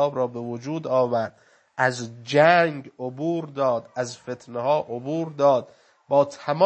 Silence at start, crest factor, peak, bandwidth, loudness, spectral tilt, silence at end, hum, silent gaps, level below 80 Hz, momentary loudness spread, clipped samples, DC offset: 0 s; 20 dB; -2 dBFS; 8.6 kHz; -24 LUFS; -5.5 dB/octave; 0 s; none; none; -74 dBFS; 15 LU; under 0.1%; under 0.1%